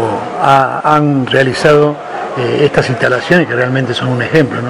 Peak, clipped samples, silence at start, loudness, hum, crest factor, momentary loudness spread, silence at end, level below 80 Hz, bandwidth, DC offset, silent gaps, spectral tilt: 0 dBFS; 1%; 0 s; -11 LUFS; none; 12 dB; 6 LU; 0 s; -44 dBFS; 12.5 kHz; under 0.1%; none; -6 dB/octave